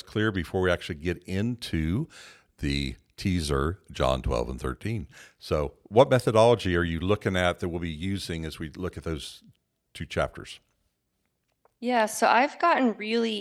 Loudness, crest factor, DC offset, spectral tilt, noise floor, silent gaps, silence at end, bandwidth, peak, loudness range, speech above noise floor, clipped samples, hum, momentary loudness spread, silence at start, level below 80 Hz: -27 LUFS; 24 dB; under 0.1%; -5.5 dB/octave; -77 dBFS; none; 0 s; 15 kHz; -4 dBFS; 10 LU; 50 dB; under 0.1%; none; 14 LU; 0.05 s; -42 dBFS